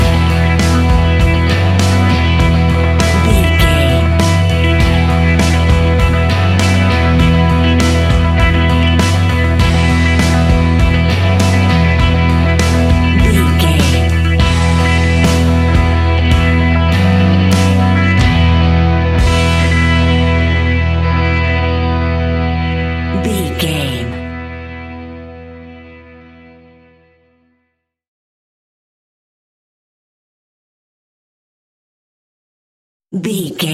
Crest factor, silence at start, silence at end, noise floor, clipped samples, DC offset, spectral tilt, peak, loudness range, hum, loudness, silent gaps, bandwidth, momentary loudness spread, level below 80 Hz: 12 dB; 0 s; 0 s; -68 dBFS; under 0.1%; under 0.1%; -6 dB/octave; 0 dBFS; 8 LU; none; -12 LUFS; 28.08-33.00 s; 13.5 kHz; 6 LU; -18 dBFS